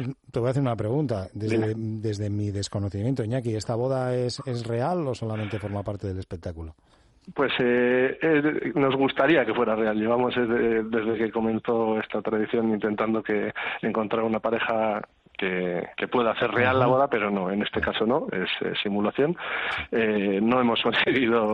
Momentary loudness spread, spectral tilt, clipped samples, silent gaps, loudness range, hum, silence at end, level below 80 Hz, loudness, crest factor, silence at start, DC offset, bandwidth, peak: 9 LU; -6.5 dB/octave; under 0.1%; none; 5 LU; none; 0 s; -56 dBFS; -25 LUFS; 16 dB; 0 s; under 0.1%; 11.5 kHz; -8 dBFS